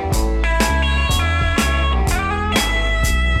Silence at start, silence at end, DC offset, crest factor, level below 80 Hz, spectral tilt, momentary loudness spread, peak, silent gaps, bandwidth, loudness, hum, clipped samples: 0 s; 0 s; under 0.1%; 16 dB; -20 dBFS; -4.5 dB/octave; 2 LU; -2 dBFS; none; 16 kHz; -18 LUFS; none; under 0.1%